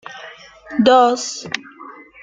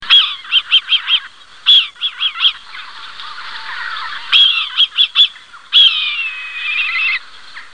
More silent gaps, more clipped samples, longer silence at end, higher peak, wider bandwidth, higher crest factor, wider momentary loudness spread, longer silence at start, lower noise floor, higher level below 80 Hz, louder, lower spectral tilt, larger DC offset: neither; neither; first, 0.3 s vs 0.1 s; about the same, -2 dBFS vs 0 dBFS; about the same, 9.4 kHz vs 10 kHz; about the same, 16 dB vs 16 dB; first, 26 LU vs 19 LU; about the same, 0.1 s vs 0 s; about the same, -39 dBFS vs -36 dBFS; about the same, -60 dBFS vs -62 dBFS; second, -16 LUFS vs -11 LUFS; first, -3.5 dB/octave vs 2.5 dB/octave; second, under 0.1% vs 0.7%